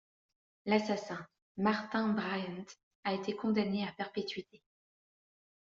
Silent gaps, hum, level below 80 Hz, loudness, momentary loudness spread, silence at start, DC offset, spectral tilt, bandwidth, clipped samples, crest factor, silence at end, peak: 1.42-1.55 s, 2.83-3.03 s; none; -76 dBFS; -35 LUFS; 13 LU; 0.65 s; under 0.1%; -4.5 dB/octave; 7.4 kHz; under 0.1%; 22 dB; 1.3 s; -16 dBFS